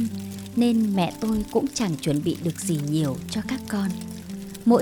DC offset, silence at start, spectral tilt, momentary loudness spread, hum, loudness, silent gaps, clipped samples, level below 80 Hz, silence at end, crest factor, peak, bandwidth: under 0.1%; 0 s; -6 dB/octave; 11 LU; none; -25 LUFS; none; under 0.1%; -50 dBFS; 0 s; 18 dB; -6 dBFS; over 20 kHz